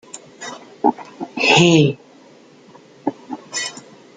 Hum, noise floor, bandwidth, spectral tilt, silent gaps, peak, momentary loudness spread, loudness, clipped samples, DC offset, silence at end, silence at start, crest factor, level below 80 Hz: none; -47 dBFS; 9.6 kHz; -4.5 dB/octave; none; 0 dBFS; 23 LU; -17 LUFS; under 0.1%; under 0.1%; 0.45 s; 0.15 s; 20 dB; -60 dBFS